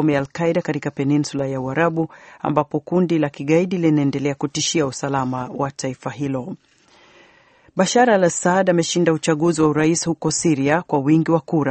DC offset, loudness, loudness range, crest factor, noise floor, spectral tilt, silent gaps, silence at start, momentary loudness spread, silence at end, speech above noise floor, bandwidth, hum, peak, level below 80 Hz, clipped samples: under 0.1%; -19 LUFS; 6 LU; 18 dB; -53 dBFS; -5 dB/octave; none; 0 s; 9 LU; 0 s; 34 dB; 8.8 kHz; none; -2 dBFS; -56 dBFS; under 0.1%